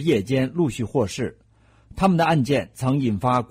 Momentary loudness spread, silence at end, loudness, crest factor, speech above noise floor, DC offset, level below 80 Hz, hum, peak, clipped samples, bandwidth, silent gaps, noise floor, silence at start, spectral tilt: 8 LU; 0.05 s; -22 LUFS; 14 dB; 29 dB; under 0.1%; -48 dBFS; none; -8 dBFS; under 0.1%; 16 kHz; none; -51 dBFS; 0 s; -6.5 dB/octave